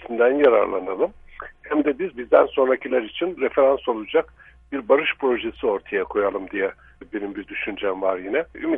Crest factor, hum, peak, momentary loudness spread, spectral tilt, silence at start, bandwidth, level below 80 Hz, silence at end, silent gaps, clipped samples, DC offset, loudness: 20 dB; none; -2 dBFS; 13 LU; -7.5 dB/octave; 0 s; 3.8 kHz; -54 dBFS; 0 s; none; under 0.1%; under 0.1%; -22 LUFS